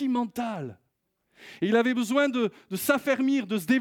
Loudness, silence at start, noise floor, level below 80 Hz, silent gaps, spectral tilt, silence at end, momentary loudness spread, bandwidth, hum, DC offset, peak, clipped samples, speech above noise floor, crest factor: -26 LUFS; 0 s; -76 dBFS; -74 dBFS; none; -5 dB/octave; 0 s; 9 LU; 18.5 kHz; none; under 0.1%; -10 dBFS; under 0.1%; 50 dB; 16 dB